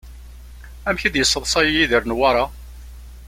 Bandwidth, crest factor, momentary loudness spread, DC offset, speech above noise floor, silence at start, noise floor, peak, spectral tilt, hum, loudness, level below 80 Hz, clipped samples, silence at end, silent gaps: 16.5 kHz; 18 dB; 9 LU; under 0.1%; 20 dB; 0.05 s; -38 dBFS; -2 dBFS; -2.5 dB/octave; 60 Hz at -35 dBFS; -18 LUFS; -36 dBFS; under 0.1%; 0 s; none